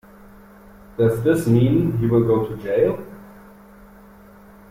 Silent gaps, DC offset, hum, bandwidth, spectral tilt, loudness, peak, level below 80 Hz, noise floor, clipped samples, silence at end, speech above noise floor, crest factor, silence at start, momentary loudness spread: none; under 0.1%; none; 15.5 kHz; -8.5 dB/octave; -19 LUFS; -6 dBFS; -46 dBFS; -46 dBFS; under 0.1%; 1.4 s; 28 dB; 16 dB; 1 s; 12 LU